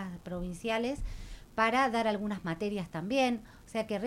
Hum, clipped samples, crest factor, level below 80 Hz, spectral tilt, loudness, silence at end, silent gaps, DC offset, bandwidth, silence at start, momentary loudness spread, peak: none; under 0.1%; 20 dB; -48 dBFS; -5.5 dB/octave; -32 LUFS; 0 s; none; under 0.1%; 16 kHz; 0 s; 12 LU; -14 dBFS